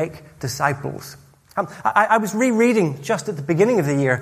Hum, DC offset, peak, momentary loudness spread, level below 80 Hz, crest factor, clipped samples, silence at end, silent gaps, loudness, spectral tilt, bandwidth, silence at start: none; under 0.1%; -2 dBFS; 14 LU; -58 dBFS; 18 dB; under 0.1%; 0 s; none; -20 LUFS; -6 dB/octave; 15.5 kHz; 0 s